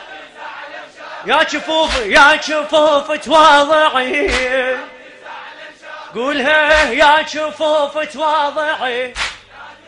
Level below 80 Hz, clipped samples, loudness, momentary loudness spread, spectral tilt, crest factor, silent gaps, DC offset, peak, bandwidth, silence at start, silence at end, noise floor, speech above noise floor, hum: -40 dBFS; under 0.1%; -13 LUFS; 23 LU; -2 dB/octave; 14 dB; none; under 0.1%; 0 dBFS; 11 kHz; 0 s; 0.15 s; -38 dBFS; 24 dB; none